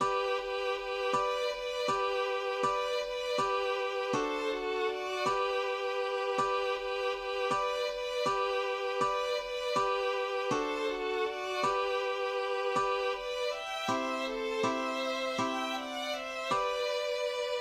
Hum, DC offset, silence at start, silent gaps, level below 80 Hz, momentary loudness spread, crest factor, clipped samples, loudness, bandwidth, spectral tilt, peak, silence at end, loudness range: none; under 0.1%; 0 s; none; -62 dBFS; 3 LU; 16 dB; under 0.1%; -32 LUFS; 15.5 kHz; -3 dB/octave; -16 dBFS; 0 s; 1 LU